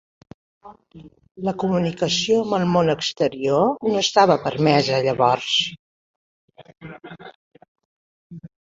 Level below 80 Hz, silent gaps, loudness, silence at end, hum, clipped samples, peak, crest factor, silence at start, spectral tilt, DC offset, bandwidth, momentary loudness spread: -58 dBFS; 5.79-6.48 s, 7.35-7.51 s, 7.68-7.75 s, 7.85-8.30 s; -20 LUFS; 0.25 s; none; under 0.1%; -2 dBFS; 20 dB; 0.65 s; -4.5 dB/octave; under 0.1%; 8 kHz; 23 LU